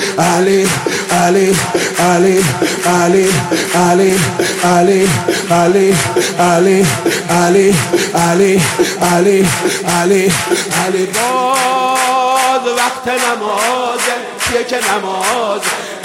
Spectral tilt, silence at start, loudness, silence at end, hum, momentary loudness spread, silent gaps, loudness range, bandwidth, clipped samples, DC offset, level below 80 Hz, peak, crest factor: -4 dB/octave; 0 s; -12 LUFS; 0 s; none; 5 LU; none; 3 LU; 16.5 kHz; under 0.1%; under 0.1%; -46 dBFS; 0 dBFS; 12 dB